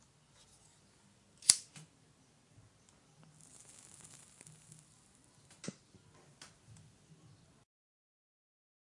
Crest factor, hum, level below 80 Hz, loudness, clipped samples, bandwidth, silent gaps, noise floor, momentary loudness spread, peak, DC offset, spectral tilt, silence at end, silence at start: 44 dB; none; -80 dBFS; -32 LUFS; under 0.1%; 11.5 kHz; none; -68 dBFS; 31 LU; 0 dBFS; under 0.1%; 0.5 dB/octave; 3.2 s; 1.45 s